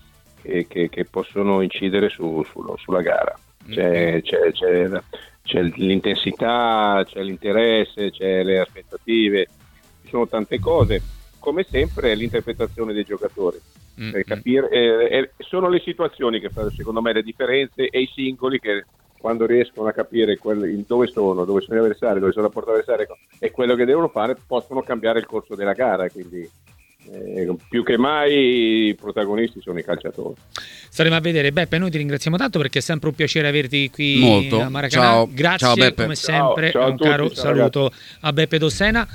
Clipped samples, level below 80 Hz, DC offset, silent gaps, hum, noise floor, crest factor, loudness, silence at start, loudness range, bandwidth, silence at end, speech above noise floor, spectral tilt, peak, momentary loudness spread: under 0.1%; -42 dBFS; under 0.1%; none; none; -51 dBFS; 20 dB; -20 LUFS; 0.45 s; 6 LU; 17 kHz; 0 s; 31 dB; -5.5 dB/octave; 0 dBFS; 10 LU